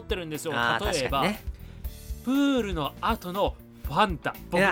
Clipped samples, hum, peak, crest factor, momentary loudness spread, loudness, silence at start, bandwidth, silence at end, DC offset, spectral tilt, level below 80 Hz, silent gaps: under 0.1%; none; -8 dBFS; 20 dB; 16 LU; -27 LUFS; 0 s; 17 kHz; 0 s; under 0.1%; -5 dB/octave; -40 dBFS; none